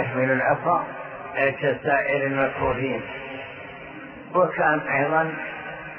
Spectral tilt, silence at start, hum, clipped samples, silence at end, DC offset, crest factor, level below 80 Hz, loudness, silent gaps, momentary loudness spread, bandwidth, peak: -10 dB/octave; 0 s; none; under 0.1%; 0 s; under 0.1%; 18 dB; -54 dBFS; -23 LUFS; none; 15 LU; 5.4 kHz; -6 dBFS